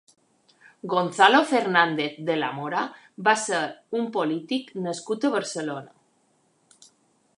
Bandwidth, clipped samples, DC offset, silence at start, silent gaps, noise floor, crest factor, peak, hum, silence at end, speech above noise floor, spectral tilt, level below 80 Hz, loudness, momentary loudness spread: 11.5 kHz; under 0.1%; under 0.1%; 0.85 s; none; -66 dBFS; 24 dB; -2 dBFS; none; 1.5 s; 42 dB; -3.5 dB/octave; -80 dBFS; -24 LUFS; 13 LU